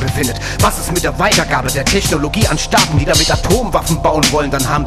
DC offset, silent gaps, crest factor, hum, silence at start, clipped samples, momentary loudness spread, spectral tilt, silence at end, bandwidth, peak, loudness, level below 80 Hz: under 0.1%; none; 12 dB; none; 0 s; under 0.1%; 5 LU; -3.5 dB/octave; 0 s; 14 kHz; 0 dBFS; -13 LUFS; -24 dBFS